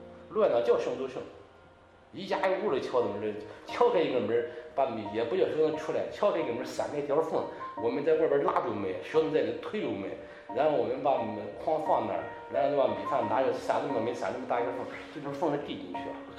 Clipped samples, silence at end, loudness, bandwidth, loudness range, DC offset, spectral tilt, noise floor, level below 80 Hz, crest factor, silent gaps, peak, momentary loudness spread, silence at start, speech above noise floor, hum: under 0.1%; 0 s; -30 LUFS; 10.5 kHz; 2 LU; under 0.1%; -6 dB/octave; -57 dBFS; -66 dBFS; 18 dB; none; -12 dBFS; 11 LU; 0 s; 27 dB; none